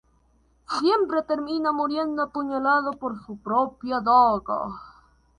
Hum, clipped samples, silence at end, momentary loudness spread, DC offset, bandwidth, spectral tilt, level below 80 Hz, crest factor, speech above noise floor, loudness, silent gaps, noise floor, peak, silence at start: none; under 0.1%; 0.5 s; 13 LU; under 0.1%; 10.5 kHz; -5.5 dB/octave; -58 dBFS; 18 dB; 39 dB; -24 LUFS; none; -62 dBFS; -6 dBFS; 0.7 s